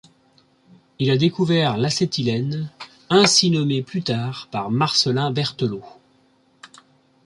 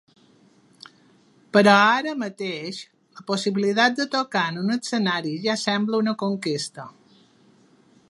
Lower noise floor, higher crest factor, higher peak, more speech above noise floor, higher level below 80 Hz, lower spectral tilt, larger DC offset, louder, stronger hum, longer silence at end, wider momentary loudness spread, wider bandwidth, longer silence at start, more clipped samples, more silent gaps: about the same, -59 dBFS vs -57 dBFS; about the same, 20 dB vs 22 dB; about the same, -2 dBFS vs -2 dBFS; first, 39 dB vs 35 dB; first, -60 dBFS vs -74 dBFS; about the same, -4.5 dB/octave vs -4.5 dB/octave; neither; about the same, -20 LUFS vs -22 LUFS; neither; second, 0.6 s vs 1.2 s; second, 12 LU vs 16 LU; about the same, 11.5 kHz vs 11.5 kHz; second, 1 s vs 1.55 s; neither; neither